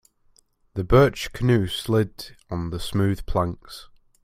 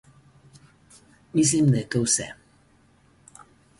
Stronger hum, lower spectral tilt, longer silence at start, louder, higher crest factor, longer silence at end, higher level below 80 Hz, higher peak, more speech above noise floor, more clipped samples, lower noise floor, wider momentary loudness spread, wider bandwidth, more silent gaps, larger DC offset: neither; first, -6.5 dB/octave vs -4.5 dB/octave; second, 0.75 s vs 1.35 s; about the same, -23 LUFS vs -22 LUFS; about the same, 22 dB vs 18 dB; second, 0.4 s vs 1.45 s; first, -38 dBFS vs -58 dBFS; first, -2 dBFS vs -10 dBFS; about the same, 39 dB vs 37 dB; neither; about the same, -61 dBFS vs -59 dBFS; first, 20 LU vs 8 LU; first, 15.5 kHz vs 11.5 kHz; neither; neither